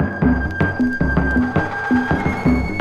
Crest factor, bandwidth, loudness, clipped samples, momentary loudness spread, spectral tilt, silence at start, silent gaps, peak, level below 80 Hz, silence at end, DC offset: 14 dB; 8 kHz; -18 LUFS; under 0.1%; 2 LU; -8 dB/octave; 0 s; none; -4 dBFS; -28 dBFS; 0 s; under 0.1%